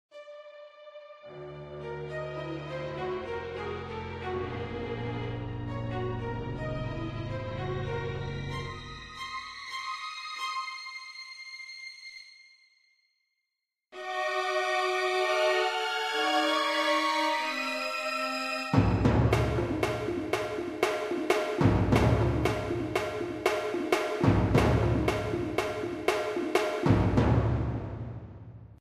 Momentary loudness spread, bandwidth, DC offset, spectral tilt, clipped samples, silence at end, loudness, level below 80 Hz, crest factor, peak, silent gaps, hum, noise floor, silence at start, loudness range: 16 LU; 15 kHz; under 0.1%; -6 dB/octave; under 0.1%; 0.05 s; -30 LUFS; -42 dBFS; 22 dB; -8 dBFS; none; none; -87 dBFS; 0.15 s; 11 LU